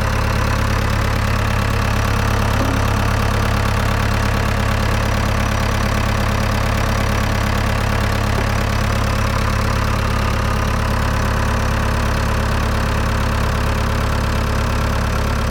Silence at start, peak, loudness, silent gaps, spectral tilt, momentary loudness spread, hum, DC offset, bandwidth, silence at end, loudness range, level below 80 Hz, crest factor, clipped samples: 0 s; -6 dBFS; -18 LUFS; none; -5.5 dB/octave; 1 LU; none; under 0.1%; 18 kHz; 0 s; 1 LU; -22 dBFS; 12 dB; under 0.1%